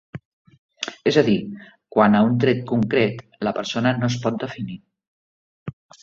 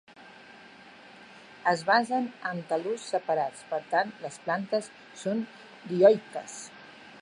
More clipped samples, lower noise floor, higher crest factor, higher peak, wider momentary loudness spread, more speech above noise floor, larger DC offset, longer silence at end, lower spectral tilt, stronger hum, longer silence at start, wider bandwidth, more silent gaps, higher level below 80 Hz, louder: neither; first, under -90 dBFS vs -51 dBFS; about the same, 20 dB vs 22 dB; first, -2 dBFS vs -8 dBFS; second, 21 LU vs 27 LU; first, over 70 dB vs 23 dB; neither; first, 0.3 s vs 0 s; first, -6.5 dB/octave vs -4.5 dB/octave; neither; about the same, 0.15 s vs 0.2 s; second, 7.6 kHz vs 11 kHz; first, 0.25-0.45 s, 0.58-0.69 s, 5.08-5.66 s vs none; first, -58 dBFS vs -80 dBFS; first, -21 LUFS vs -28 LUFS